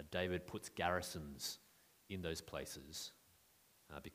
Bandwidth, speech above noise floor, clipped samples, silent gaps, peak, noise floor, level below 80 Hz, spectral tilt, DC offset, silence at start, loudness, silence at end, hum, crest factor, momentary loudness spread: 15.5 kHz; 27 dB; under 0.1%; none; -22 dBFS; -72 dBFS; -66 dBFS; -3.5 dB/octave; under 0.1%; 0 s; -45 LUFS; 0 s; none; 24 dB; 12 LU